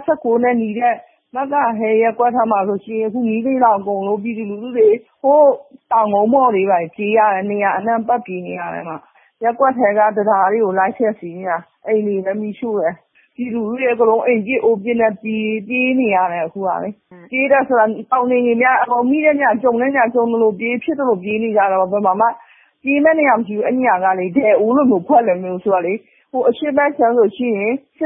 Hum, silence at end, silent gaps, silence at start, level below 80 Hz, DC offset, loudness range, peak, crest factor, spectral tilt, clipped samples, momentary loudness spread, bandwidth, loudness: none; 0 s; none; 0 s; -64 dBFS; under 0.1%; 3 LU; -2 dBFS; 14 dB; -11.5 dB/octave; under 0.1%; 10 LU; 3.8 kHz; -16 LUFS